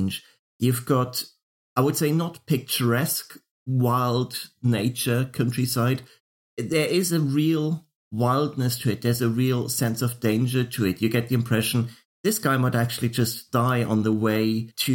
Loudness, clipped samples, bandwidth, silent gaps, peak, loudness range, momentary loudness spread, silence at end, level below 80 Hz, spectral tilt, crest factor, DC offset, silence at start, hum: -24 LUFS; under 0.1%; 17 kHz; 0.39-0.60 s, 1.42-1.76 s, 3.51-3.66 s, 6.20-6.57 s, 7.95-8.11 s, 12.05-12.24 s; -8 dBFS; 1 LU; 7 LU; 0 s; -62 dBFS; -5.5 dB/octave; 16 dB; under 0.1%; 0 s; none